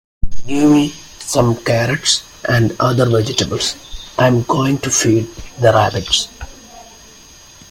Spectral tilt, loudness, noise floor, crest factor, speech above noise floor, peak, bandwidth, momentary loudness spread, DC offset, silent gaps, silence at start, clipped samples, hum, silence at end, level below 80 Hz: -4.5 dB/octave; -15 LUFS; -41 dBFS; 16 dB; 27 dB; 0 dBFS; 16.5 kHz; 15 LU; under 0.1%; none; 0.25 s; under 0.1%; none; 0.9 s; -36 dBFS